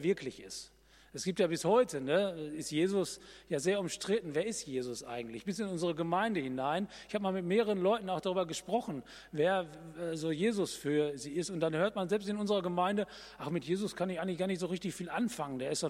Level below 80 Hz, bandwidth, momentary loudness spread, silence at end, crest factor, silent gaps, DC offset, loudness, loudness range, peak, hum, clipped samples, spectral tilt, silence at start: -68 dBFS; 15.5 kHz; 9 LU; 0 s; 18 dB; none; under 0.1%; -34 LUFS; 2 LU; -16 dBFS; none; under 0.1%; -5 dB/octave; 0 s